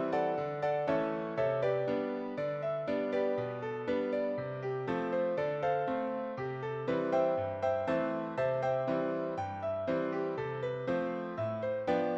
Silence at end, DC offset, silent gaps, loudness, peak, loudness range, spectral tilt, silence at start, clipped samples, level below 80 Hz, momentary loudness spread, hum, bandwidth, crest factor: 0 s; under 0.1%; none; -34 LUFS; -18 dBFS; 2 LU; -8 dB/octave; 0 s; under 0.1%; -70 dBFS; 5 LU; none; 7.8 kHz; 14 dB